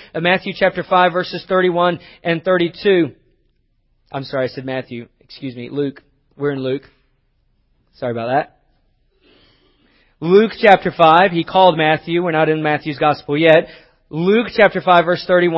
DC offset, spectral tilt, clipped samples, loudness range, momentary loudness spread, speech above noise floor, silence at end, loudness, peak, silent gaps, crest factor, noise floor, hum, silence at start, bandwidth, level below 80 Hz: under 0.1%; -8 dB/octave; under 0.1%; 13 LU; 15 LU; 46 dB; 0 s; -16 LUFS; 0 dBFS; none; 16 dB; -62 dBFS; none; 0.15 s; 7.4 kHz; -56 dBFS